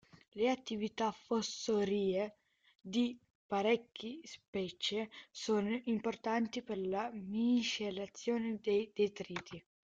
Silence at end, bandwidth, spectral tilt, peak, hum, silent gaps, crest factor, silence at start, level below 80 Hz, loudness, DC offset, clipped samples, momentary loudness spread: 0.3 s; 7.8 kHz; -4.5 dB/octave; -20 dBFS; none; 0.28-0.32 s, 2.75-2.79 s, 3.30-3.49 s, 4.48-4.53 s; 18 dB; 0.15 s; -74 dBFS; -37 LUFS; under 0.1%; under 0.1%; 12 LU